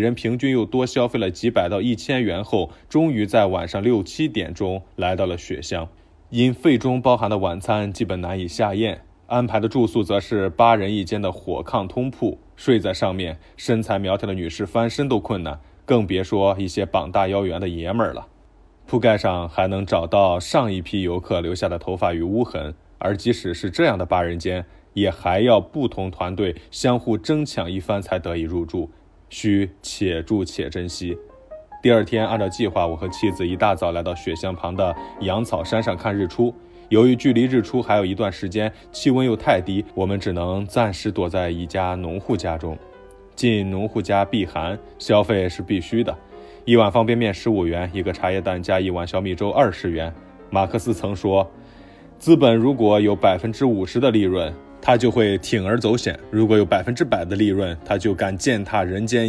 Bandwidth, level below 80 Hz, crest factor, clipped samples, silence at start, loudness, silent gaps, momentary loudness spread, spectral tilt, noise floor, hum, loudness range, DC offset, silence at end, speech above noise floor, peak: 11 kHz; -44 dBFS; 20 dB; under 0.1%; 0 s; -21 LUFS; none; 10 LU; -6.5 dB/octave; -51 dBFS; none; 4 LU; under 0.1%; 0 s; 30 dB; -2 dBFS